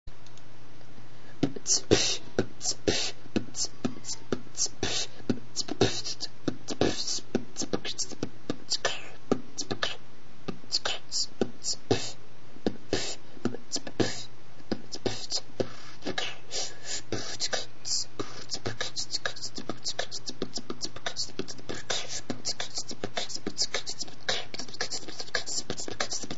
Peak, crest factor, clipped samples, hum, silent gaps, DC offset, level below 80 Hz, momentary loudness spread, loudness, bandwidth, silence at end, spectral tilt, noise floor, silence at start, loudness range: -6 dBFS; 28 dB; under 0.1%; none; none; 4%; -58 dBFS; 10 LU; -32 LUFS; 8.2 kHz; 0 s; -2.5 dB/octave; -53 dBFS; 0.05 s; 5 LU